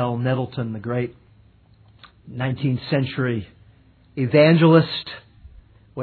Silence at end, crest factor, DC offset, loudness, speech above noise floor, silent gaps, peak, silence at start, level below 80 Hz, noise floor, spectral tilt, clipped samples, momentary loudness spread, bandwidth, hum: 0 s; 20 dB; under 0.1%; -20 LUFS; 33 dB; none; -2 dBFS; 0 s; -54 dBFS; -53 dBFS; -10.5 dB/octave; under 0.1%; 22 LU; 4.6 kHz; none